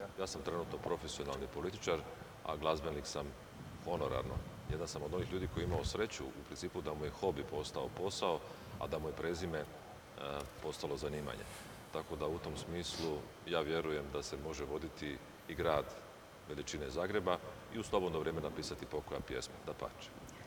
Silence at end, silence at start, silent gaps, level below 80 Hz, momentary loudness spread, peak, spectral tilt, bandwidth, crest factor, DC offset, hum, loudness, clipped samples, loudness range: 0 s; 0 s; none; -56 dBFS; 10 LU; -18 dBFS; -5 dB/octave; over 20 kHz; 22 dB; under 0.1%; none; -41 LUFS; under 0.1%; 3 LU